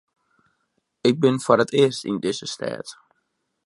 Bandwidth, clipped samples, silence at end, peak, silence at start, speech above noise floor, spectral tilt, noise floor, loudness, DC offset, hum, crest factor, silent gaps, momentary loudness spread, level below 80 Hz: 11.5 kHz; under 0.1%; 0.75 s; -2 dBFS; 1.05 s; 53 dB; -5 dB/octave; -74 dBFS; -21 LUFS; under 0.1%; none; 22 dB; none; 12 LU; -68 dBFS